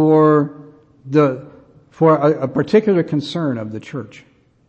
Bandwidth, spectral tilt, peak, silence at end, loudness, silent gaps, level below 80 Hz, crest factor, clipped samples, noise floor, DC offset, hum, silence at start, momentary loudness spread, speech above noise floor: 8.4 kHz; -8.5 dB/octave; -2 dBFS; 0.6 s; -16 LUFS; none; -60 dBFS; 16 dB; under 0.1%; -45 dBFS; under 0.1%; none; 0 s; 17 LU; 30 dB